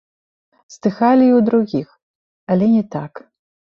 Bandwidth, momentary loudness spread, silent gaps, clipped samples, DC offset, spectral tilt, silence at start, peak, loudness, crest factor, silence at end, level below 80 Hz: 7.2 kHz; 14 LU; 2.02-2.47 s; under 0.1%; under 0.1%; -8.5 dB/octave; 0.7 s; -2 dBFS; -16 LUFS; 16 dB; 0.45 s; -60 dBFS